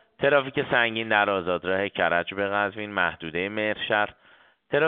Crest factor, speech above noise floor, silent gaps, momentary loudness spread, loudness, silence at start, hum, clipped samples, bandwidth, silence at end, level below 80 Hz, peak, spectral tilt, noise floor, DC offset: 20 dB; 29 dB; none; 5 LU; -25 LUFS; 0.2 s; none; under 0.1%; 4.4 kHz; 0 s; -62 dBFS; -6 dBFS; -2 dB/octave; -54 dBFS; under 0.1%